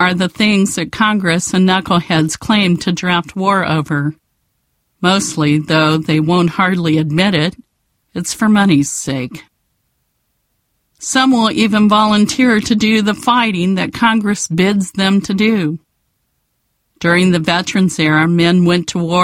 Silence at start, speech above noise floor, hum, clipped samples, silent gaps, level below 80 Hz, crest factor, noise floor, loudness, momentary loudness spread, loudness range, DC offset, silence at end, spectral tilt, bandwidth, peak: 0 s; 53 dB; none; under 0.1%; none; -48 dBFS; 14 dB; -66 dBFS; -13 LUFS; 7 LU; 4 LU; under 0.1%; 0 s; -5 dB/octave; 15.5 kHz; 0 dBFS